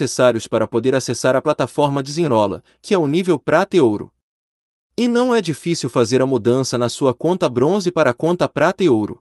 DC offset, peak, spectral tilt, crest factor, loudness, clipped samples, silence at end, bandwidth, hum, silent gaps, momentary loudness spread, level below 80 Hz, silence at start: under 0.1%; -2 dBFS; -5.5 dB/octave; 16 dB; -17 LUFS; under 0.1%; 0.05 s; 12 kHz; none; 4.23-4.90 s; 5 LU; -58 dBFS; 0 s